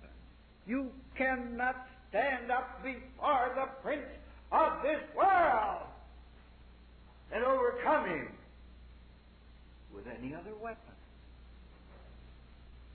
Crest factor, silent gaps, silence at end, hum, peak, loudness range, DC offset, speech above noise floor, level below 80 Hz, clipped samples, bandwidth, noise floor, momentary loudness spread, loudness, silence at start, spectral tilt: 18 dB; none; 0 s; none; -18 dBFS; 17 LU; under 0.1%; 24 dB; -56 dBFS; under 0.1%; 4.5 kHz; -57 dBFS; 19 LU; -33 LUFS; 0 s; -8.5 dB/octave